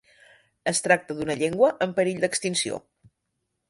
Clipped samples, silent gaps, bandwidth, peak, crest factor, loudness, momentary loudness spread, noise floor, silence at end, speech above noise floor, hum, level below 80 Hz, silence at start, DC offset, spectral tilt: under 0.1%; none; 11.5 kHz; -6 dBFS; 20 dB; -24 LUFS; 9 LU; -79 dBFS; 0.9 s; 55 dB; none; -64 dBFS; 0.65 s; under 0.1%; -3.5 dB/octave